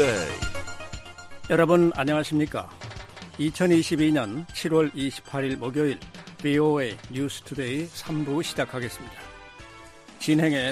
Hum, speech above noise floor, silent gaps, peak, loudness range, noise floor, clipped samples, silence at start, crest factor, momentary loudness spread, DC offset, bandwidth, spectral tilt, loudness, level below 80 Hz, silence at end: none; 22 dB; none; -8 dBFS; 5 LU; -47 dBFS; under 0.1%; 0 s; 18 dB; 20 LU; under 0.1%; 14.5 kHz; -5.5 dB/octave; -25 LUFS; -50 dBFS; 0 s